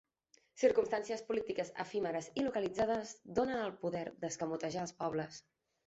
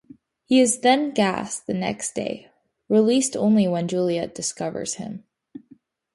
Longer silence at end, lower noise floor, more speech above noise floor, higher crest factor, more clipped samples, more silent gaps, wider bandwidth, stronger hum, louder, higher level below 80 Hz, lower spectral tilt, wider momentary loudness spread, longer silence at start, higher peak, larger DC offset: about the same, 0.45 s vs 0.55 s; first, -72 dBFS vs -55 dBFS; about the same, 36 dB vs 33 dB; about the same, 20 dB vs 18 dB; neither; neither; second, 8 kHz vs 11.5 kHz; neither; second, -37 LUFS vs -22 LUFS; second, -70 dBFS vs -62 dBFS; about the same, -4.5 dB/octave vs -4.5 dB/octave; second, 8 LU vs 12 LU; about the same, 0.55 s vs 0.5 s; second, -18 dBFS vs -6 dBFS; neither